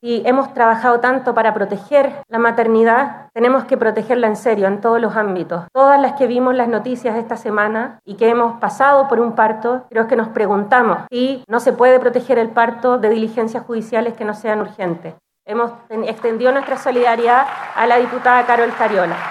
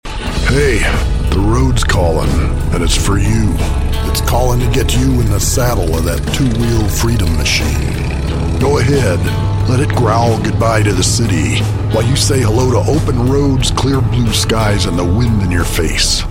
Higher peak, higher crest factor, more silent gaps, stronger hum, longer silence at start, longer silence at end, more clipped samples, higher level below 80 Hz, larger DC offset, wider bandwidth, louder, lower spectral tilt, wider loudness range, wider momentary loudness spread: about the same, 0 dBFS vs -2 dBFS; first, 16 dB vs 10 dB; neither; neither; about the same, 0.05 s vs 0.05 s; about the same, 0 s vs 0 s; neither; second, -72 dBFS vs -18 dBFS; neither; second, 11.5 kHz vs 17 kHz; second, -16 LUFS vs -13 LUFS; about the same, -6 dB/octave vs -5 dB/octave; about the same, 4 LU vs 2 LU; first, 9 LU vs 4 LU